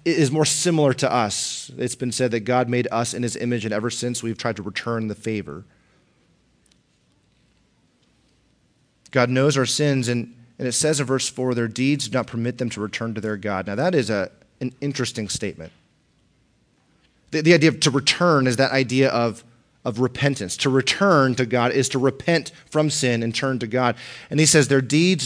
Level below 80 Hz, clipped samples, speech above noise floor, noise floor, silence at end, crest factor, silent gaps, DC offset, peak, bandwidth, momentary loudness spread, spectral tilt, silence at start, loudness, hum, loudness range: -60 dBFS; under 0.1%; 42 dB; -63 dBFS; 0 s; 20 dB; none; under 0.1%; -2 dBFS; 10.5 kHz; 11 LU; -4.5 dB/octave; 0.05 s; -21 LUFS; none; 10 LU